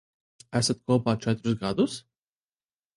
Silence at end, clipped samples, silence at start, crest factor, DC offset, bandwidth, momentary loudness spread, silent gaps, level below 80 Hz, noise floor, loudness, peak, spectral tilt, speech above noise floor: 0.95 s; under 0.1%; 0.5 s; 18 dB; under 0.1%; 11.5 kHz; 5 LU; none; -60 dBFS; under -90 dBFS; -27 LUFS; -10 dBFS; -5.5 dB/octave; over 64 dB